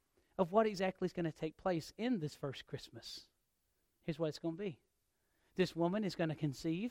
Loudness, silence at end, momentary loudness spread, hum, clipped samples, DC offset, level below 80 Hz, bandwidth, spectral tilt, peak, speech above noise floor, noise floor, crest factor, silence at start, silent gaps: -39 LUFS; 0 s; 14 LU; none; under 0.1%; under 0.1%; -70 dBFS; 16 kHz; -6.5 dB/octave; -18 dBFS; 44 dB; -82 dBFS; 22 dB; 0.4 s; none